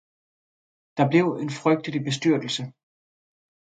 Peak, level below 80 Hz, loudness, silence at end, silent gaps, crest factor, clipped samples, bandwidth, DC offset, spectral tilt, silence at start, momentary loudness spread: -6 dBFS; -72 dBFS; -24 LUFS; 1.1 s; none; 20 dB; under 0.1%; 9.2 kHz; under 0.1%; -6 dB/octave; 0.95 s; 10 LU